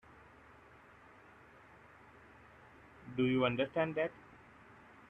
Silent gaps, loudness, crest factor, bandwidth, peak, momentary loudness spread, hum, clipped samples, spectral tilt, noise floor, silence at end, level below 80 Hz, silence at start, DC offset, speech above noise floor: none; -35 LUFS; 20 dB; 5.6 kHz; -20 dBFS; 26 LU; none; under 0.1%; -8 dB/octave; -60 dBFS; 0.9 s; -70 dBFS; 3 s; under 0.1%; 27 dB